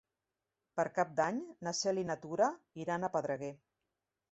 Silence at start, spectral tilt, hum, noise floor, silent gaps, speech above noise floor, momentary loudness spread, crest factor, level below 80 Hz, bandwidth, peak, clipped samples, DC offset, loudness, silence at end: 0.75 s; -4 dB/octave; none; -90 dBFS; none; 54 dB; 8 LU; 20 dB; -78 dBFS; 8 kHz; -16 dBFS; under 0.1%; under 0.1%; -36 LUFS; 0.75 s